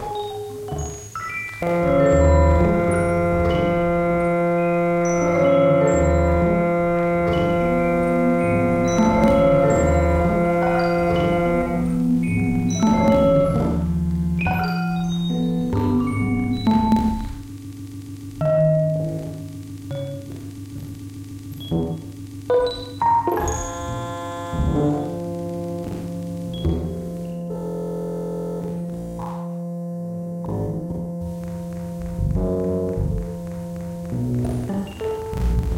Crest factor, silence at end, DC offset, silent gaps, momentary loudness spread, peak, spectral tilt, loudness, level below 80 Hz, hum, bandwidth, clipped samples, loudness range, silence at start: 16 dB; 0 s; under 0.1%; none; 14 LU; -6 dBFS; -7 dB/octave; -21 LUFS; -32 dBFS; none; 15.5 kHz; under 0.1%; 10 LU; 0 s